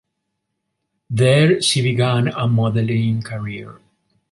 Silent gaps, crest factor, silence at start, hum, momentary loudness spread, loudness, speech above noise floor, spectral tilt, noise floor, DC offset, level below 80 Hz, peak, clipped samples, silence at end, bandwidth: none; 16 dB; 1.1 s; none; 14 LU; -17 LUFS; 59 dB; -5.5 dB/octave; -76 dBFS; under 0.1%; -54 dBFS; -2 dBFS; under 0.1%; 0.6 s; 11.5 kHz